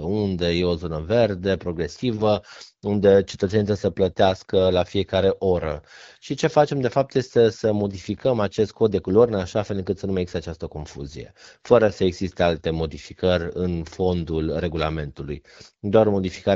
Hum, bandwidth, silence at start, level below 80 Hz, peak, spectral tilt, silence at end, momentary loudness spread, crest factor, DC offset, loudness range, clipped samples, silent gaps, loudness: none; 7.8 kHz; 0 s; -44 dBFS; 0 dBFS; -5.5 dB/octave; 0 s; 14 LU; 22 dB; under 0.1%; 3 LU; under 0.1%; none; -22 LUFS